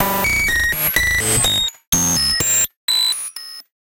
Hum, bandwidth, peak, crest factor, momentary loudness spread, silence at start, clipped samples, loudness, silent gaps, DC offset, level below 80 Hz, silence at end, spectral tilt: none; 17.5 kHz; -2 dBFS; 16 dB; 7 LU; 0 s; under 0.1%; -15 LUFS; 1.87-1.92 s, 2.76-2.88 s; under 0.1%; -34 dBFS; 0.25 s; -1 dB/octave